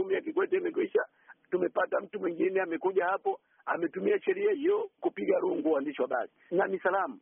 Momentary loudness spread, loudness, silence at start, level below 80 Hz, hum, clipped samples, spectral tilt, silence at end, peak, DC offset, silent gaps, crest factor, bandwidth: 6 LU; -30 LUFS; 0 s; -80 dBFS; none; under 0.1%; -0.5 dB/octave; 0.05 s; -14 dBFS; under 0.1%; none; 16 dB; 3.6 kHz